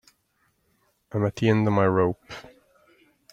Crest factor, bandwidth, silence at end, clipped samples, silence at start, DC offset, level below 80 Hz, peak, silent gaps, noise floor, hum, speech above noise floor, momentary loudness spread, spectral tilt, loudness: 20 dB; 7.8 kHz; 0.9 s; under 0.1%; 1.15 s; under 0.1%; -60 dBFS; -6 dBFS; none; -70 dBFS; none; 47 dB; 19 LU; -8 dB/octave; -23 LUFS